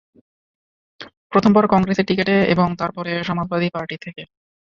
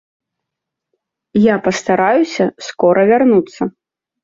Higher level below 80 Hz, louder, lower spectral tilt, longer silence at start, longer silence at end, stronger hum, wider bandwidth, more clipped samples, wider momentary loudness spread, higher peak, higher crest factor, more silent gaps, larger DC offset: about the same, -52 dBFS vs -56 dBFS; second, -18 LUFS vs -14 LUFS; first, -7.5 dB/octave vs -6 dB/octave; second, 1 s vs 1.35 s; about the same, 0.55 s vs 0.55 s; neither; about the same, 7.2 kHz vs 7.6 kHz; neither; first, 15 LU vs 10 LU; about the same, -2 dBFS vs -2 dBFS; about the same, 18 dB vs 14 dB; first, 1.17-1.30 s vs none; neither